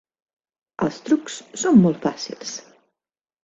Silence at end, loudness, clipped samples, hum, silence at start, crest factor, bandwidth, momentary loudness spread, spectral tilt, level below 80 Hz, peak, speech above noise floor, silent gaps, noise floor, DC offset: 0.85 s; -21 LUFS; under 0.1%; none; 0.8 s; 20 dB; 8 kHz; 17 LU; -5.5 dB/octave; -62 dBFS; -4 dBFS; 69 dB; none; -89 dBFS; under 0.1%